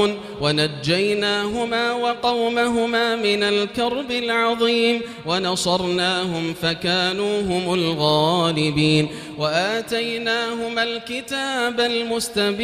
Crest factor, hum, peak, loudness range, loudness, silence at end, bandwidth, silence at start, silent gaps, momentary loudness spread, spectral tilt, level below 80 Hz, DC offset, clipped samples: 18 dB; none; -4 dBFS; 2 LU; -20 LUFS; 0 s; 15.5 kHz; 0 s; none; 5 LU; -4.5 dB/octave; -52 dBFS; under 0.1%; under 0.1%